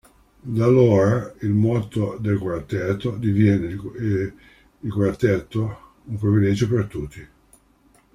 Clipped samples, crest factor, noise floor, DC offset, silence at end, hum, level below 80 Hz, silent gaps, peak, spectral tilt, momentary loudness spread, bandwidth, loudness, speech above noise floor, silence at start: under 0.1%; 16 dB; -57 dBFS; under 0.1%; 0.9 s; none; -48 dBFS; none; -4 dBFS; -8.5 dB/octave; 14 LU; 10.5 kHz; -21 LUFS; 37 dB; 0.45 s